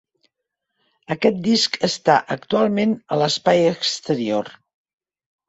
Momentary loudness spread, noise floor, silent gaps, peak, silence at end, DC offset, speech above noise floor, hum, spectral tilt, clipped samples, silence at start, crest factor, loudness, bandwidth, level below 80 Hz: 6 LU; -79 dBFS; none; -2 dBFS; 0.95 s; under 0.1%; 60 dB; none; -4.5 dB/octave; under 0.1%; 1.1 s; 18 dB; -19 LUFS; 8.2 kHz; -62 dBFS